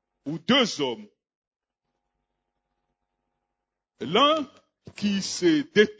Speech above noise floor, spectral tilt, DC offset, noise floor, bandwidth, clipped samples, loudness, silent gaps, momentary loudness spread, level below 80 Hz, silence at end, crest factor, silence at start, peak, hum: 61 dB; -4 dB/octave; under 0.1%; -85 dBFS; 8 kHz; under 0.1%; -24 LUFS; 1.36-1.51 s; 16 LU; -70 dBFS; 0.05 s; 22 dB; 0.25 s; -6 dBFS; none